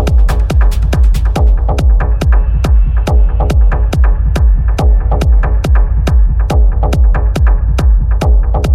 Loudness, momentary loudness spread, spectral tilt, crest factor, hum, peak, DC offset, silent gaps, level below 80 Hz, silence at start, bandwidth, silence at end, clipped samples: -12 LUFS; 1 LU; -7 dB/octave; 8 dB; none; 0 dBFS; under 0.1%; none; -8 dBFS; 0 s; 7.8 kHz; 0 s; under 0.1%